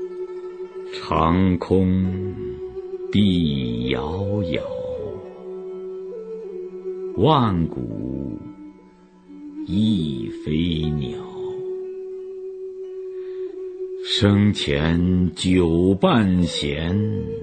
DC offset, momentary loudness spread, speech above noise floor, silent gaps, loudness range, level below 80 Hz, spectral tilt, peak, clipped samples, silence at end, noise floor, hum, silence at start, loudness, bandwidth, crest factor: under 0.1%; 15 LU; 29 dB; none; 9 LU; -42 dBFS; -7 dB/octave; -2 dBFS; under 0.1%; 0 s; -49 dBFS; none; 0 s; -22 LUFS; 9.2 kHz; 20 dB